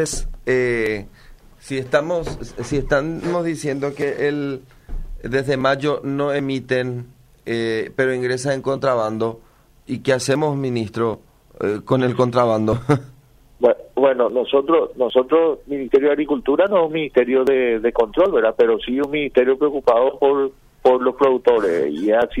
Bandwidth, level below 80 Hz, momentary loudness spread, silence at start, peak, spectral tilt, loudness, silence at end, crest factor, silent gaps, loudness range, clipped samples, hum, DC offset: 14 kHz; -40 dBFS; 9 LU; 0 s; -4 dBFS; -6 dB/octave; -19 LUFS; 0 s; 16 dB; none; 5 LU; under 0.1%; none; under 0.1%